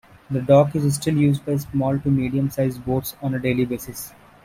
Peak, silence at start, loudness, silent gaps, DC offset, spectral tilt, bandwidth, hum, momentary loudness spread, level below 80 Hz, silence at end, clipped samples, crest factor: -4 dBFS; 0.3 s; -21 LUFS; none; under 0.1%; -7 dB/octave; 16.5 kHz; none; 12 LU; -48 dBFS; 0.35 s; under 0.1%; 18 dB